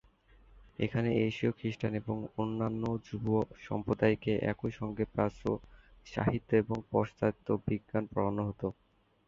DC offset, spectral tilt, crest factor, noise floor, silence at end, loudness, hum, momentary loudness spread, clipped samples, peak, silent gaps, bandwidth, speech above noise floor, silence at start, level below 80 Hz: under 0.1%; -8.5 dB/octave; 20 dB; -62 dBFS; 0.55 s; -34 LUFS; none; 7 LU; under 0.1%; -14 dBFS; none; 7.4 kHz; 29 dB; 0.55 s; -56 dBFS